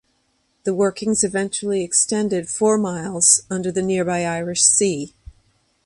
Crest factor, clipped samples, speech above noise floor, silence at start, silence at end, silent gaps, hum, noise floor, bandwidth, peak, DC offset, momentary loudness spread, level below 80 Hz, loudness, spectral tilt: 20 dB; under 0.1%; 46 dB; 0.65 s; 0.75 s; none; none; -66 dBFS; 11.5 kHz; 0 dBFS; under 0.1%; 10 LU; -54 dBFS; -18 LUFS; -3 dB/octave